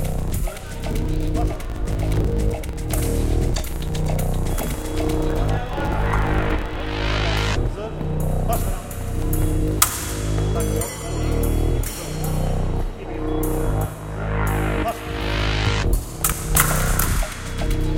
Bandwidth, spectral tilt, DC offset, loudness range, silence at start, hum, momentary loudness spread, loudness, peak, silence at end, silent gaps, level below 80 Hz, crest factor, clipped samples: 17 kHz; -5 dB/octave; under 0.1%; 3 LU; 0 s; none; 8 LU; -23 LUFS; 0 dBFS; 0 s; none; -24 dBFS; 22 dB; under 0.1%